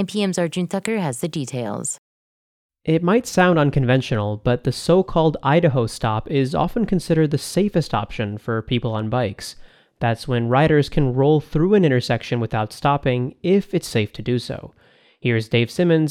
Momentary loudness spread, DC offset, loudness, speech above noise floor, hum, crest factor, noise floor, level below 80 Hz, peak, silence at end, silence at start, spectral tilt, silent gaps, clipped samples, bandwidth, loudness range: 9 LU; under 0.1%; -20 LUFS; over 71 dB; none; 18 dB; under -90 dBFS; -42 dBFS; -2 dBFS; 0 s; 0 s; -6 dB/octave; 1.98-2.69 s; under 0.1%; 15 kHz; 4 LU